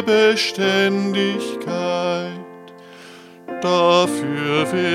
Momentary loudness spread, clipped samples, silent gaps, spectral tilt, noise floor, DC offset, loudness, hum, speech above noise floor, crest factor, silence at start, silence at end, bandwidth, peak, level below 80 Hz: 16 LU; under 0.1%; none; -4.5 dB/octave; -41 dBFS; under 0.1%; -19 LUFS; none; 23 dB; 18 dB; 0 s; 0 s; 15 kHz; -2 dBFS; -70 dBFS